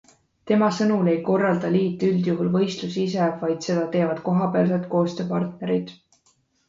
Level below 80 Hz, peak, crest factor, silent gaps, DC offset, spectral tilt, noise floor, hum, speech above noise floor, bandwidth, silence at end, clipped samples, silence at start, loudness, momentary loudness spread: -64 dBFS; -8 dBFS; 16 dB; none; under 0.1%; -7 dB/octave; -65 dBFS; none; 43 dB; 7.6 kHz; 0.75 s; under 0.1%; 0.45 s; -23 LUFS; 6 LU